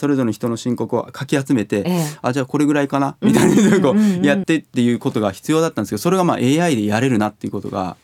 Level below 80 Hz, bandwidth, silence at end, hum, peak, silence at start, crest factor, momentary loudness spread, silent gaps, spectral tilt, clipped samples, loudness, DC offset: -58 dBFS; 17 kHz; 0.1 s; none; 0 dBFS; 0 s; 16 dB; 9 LU; none; -6 dB/octave; under 0.1%; -18 LUFS; under 0.1%